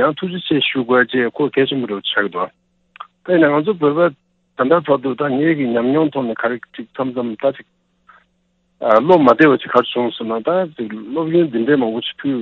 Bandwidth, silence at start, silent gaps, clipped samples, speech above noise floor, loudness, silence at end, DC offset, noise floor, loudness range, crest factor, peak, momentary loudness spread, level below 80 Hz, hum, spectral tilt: 5.8 kHz; 0 s; none; under 0.1%; 48 dB; -16 LUFS; 0 s; under 0.1%; -64 dBFS; 4 LU; 16 dB; 0 dBFS; 12 LU; -62 dBFS; none; -8 dB/octave